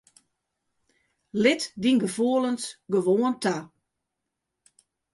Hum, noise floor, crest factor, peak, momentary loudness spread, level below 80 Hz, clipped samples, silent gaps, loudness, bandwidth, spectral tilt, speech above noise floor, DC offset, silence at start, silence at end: none; -83 dBFS; 20 dB; -8 dBFS; 8 LU; -70 dBFS; under 0.1%; none; -25 LUFS; 11.5 kHz; -4.5 dB/octave; 59 dB; under 0.1%; 1.35 s; 1.45 s